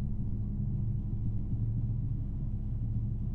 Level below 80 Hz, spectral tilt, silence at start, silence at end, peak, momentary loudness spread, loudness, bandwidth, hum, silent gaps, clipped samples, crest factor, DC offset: -36 dBFS; -12.5 dB/octave; 0 s; 0 s; -22 dBFS; 3 LU; -35 LUFS; 1.4 kHz; none; none; under 0.1%; 10 dB; under 0.1%